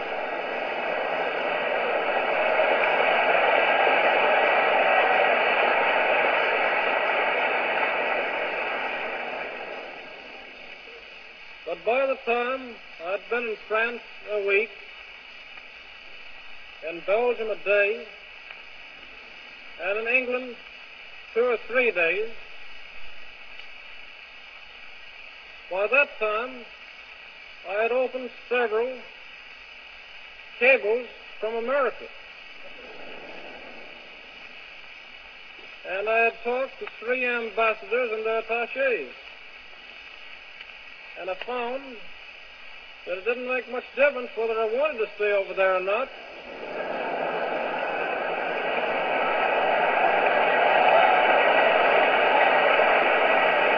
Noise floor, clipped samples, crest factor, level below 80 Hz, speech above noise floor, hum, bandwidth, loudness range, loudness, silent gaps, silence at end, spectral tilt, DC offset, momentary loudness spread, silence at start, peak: -45 dBFS; under 0.1%; 20 dB; -64 dBFS; 19 dB; none; 5.4 kHz; 12 LU; -23 LUFS; none; 0 s; -4.5 dB/octave; under 0.1%; 22 LU; 0 s; -6 dBFS